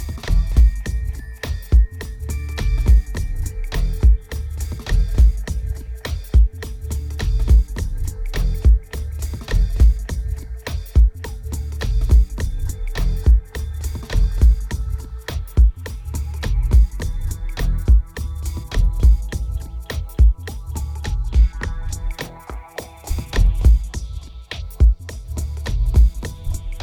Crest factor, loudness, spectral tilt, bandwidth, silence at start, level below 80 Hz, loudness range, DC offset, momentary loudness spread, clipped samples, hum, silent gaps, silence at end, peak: 14 dB; -21 LUFS; -6 dB/octave; 14.5 kHz; 0 s; -18 dBFS; 2 LU; under 0.1%; 12 LU; under 0.1%; none; none; 0 s; -2 dBFS